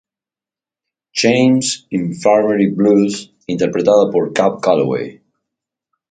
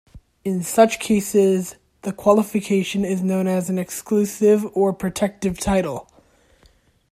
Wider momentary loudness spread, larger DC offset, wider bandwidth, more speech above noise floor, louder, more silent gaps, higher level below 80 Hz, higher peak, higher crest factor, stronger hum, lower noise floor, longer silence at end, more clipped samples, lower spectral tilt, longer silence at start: about the same, 10 LU vs 10 LU; neither; second, 9.6 kHz vs 15.5 kHz; first, 76 dB vs 37 dB; first, -15 LUFS vs -20 LUFS; neither; second, -58 dBFS vs -48 dBFS; about the same, 0 dBFS vs -2 dBFS; about the same, 16 dB vs 18 dB; neither; first, -90 dBFS vs -56 dBFS; about the same, 1 s vs 1.1 s; neither; about the same, -5 dB/octave vs -5.5 dB/octave; first, 1.15 s vs 0.15 s